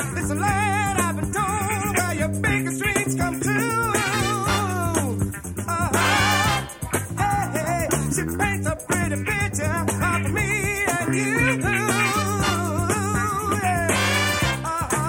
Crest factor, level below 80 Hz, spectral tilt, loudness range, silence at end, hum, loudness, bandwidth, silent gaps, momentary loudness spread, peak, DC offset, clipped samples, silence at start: 16 dB; -40 dBFS; -4 dB/octave; 2 LU; 0 s; none; -22 LUFS; 17 kHz; none; 4 LU; -6 dBFS; under 0.1%; under 0.1%; 0 s